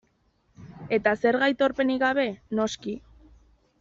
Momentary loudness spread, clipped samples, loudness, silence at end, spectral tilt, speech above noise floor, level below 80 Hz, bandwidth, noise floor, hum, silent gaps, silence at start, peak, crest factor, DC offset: 13 LU; under 0.1%; -25 LUFS; 0.85 s; -3 dB/octave; 43 dB; -60 dBFS; 7.8 kHz; -68 dBFS; none; none; 0.6 s; -8 dBFS; 18 dB; under 0.1%